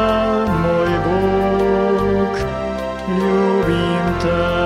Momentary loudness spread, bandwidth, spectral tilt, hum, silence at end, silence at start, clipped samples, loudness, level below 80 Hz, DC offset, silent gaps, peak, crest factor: 6 LU; 14 kHz; -7 dB/octave; none; 0 s; 0 s; under 0.1%; -17 LUFS; -34 dBFS; under 0.1%; none; -4 dBFS; 12 dB